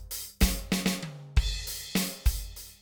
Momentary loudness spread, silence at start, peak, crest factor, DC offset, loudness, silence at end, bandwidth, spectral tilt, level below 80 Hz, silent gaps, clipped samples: 9 LU; 0 s; -10 dBFS; 20 dB; under 0.1%; -30 LUFS; 0.05 s; over 20 kHz; -4 dB/octave; -32 dBFS; none; under 0.1%